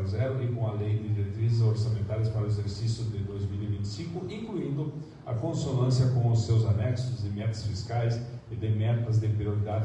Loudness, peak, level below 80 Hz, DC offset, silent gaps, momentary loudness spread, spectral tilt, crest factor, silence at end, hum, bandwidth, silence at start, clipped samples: -29 LUFS; -14 dBFS; -54 dBFS; under 0.1%; none; 10 LU; -7.5 dB/octave; 14 dB; 0 s; none; 8.6 kHz; 0 s; under 0.1%